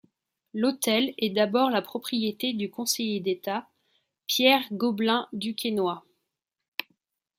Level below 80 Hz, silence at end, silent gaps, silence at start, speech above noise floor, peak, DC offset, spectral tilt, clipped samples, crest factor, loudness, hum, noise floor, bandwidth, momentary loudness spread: -76 dBFS; 0.55 s; 6.68-6.78 s; 0.55 s; 57 dB; -6 dBFS; under 0.1%; -3.5 dB/octave; under 0.1%; 22 dB; -26 LUFS; none; -83 dBFS; 16.5 kHz; 14 LU